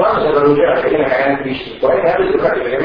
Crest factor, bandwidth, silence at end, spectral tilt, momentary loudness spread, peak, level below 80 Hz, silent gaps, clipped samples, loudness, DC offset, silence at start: 14 dB; 5.2 kHz; 0 s; -8.5 dB/octave; 6 LU; 0 dBFS; -42 dBFS; none; under 0.1%; -14 LUFS; under 0.1%; 0 s